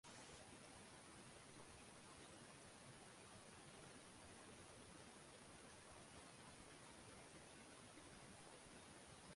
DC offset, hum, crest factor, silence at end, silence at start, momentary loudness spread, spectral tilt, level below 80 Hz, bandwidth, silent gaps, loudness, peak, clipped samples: under 0.1%; none; 16 dB; 0 s; 0.05 s; 1 LU; -3 dB/octave; -78 dBFS; 11.5 kHz; none; -61 LUFS; -48 dBFS; under 0.1%